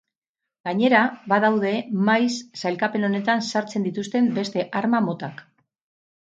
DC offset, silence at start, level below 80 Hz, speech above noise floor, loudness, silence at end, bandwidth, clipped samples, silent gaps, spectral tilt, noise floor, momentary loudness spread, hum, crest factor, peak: under 0.1%; 0.65 s; -72 dBFS; 64 dB; -22 LUFS; 0.8 s; 8.8 kHz; under 0.1%; none; -5.5 dB/octave; -86 dBFS; 9 LU; none; 18 dB; -4 dBFS